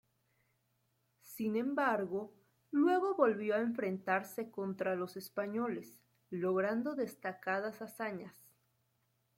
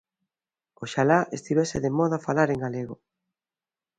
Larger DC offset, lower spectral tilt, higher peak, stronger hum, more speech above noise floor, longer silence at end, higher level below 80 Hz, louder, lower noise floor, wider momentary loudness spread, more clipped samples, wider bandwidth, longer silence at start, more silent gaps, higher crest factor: neither; about the same, -6.5 dB/octave vs -6 dB/octave; second, -16 dBFS vs -6 dBFS; neither; second, 43 dB vs over 65 dB; about the same, 1.05 s vs 1.05 s; second, -84 dBFS vs -58 dBFS; second, -36 LUFS vs -25 LUFS; second, -79 dBFS vs under -90 dBFS; second, 12 LU vs 15 LU; neither; first, 16.5 kHz vs 9.4 kHz; first, 1.25 s vs 0.8 s; neither; about the same, 20 dB vs 20 dB